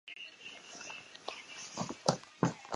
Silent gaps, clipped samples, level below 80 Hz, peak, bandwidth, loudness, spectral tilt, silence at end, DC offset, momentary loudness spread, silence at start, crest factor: none; under 0.1%; -72 dBFS; -12 dBFS; 11.5 kHz; -40 LUFS; -4 dB/octave; 0 s; under 0.1%; 12 LU; 0.05 s; 28 dB